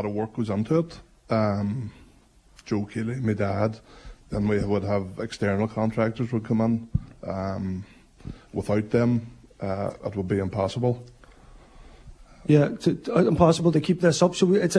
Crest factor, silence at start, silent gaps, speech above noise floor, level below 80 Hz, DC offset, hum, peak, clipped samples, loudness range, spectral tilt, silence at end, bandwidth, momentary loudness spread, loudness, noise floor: 22 dB; 0 s; none; 32 dB; -48 dBFS; under 0.1%; none; -4 dBFS; under 0.1%; 5 LU; -7 dB/octave; 0 s; 11 kHz; 14 LU; -25 LUFS; -56 dBFS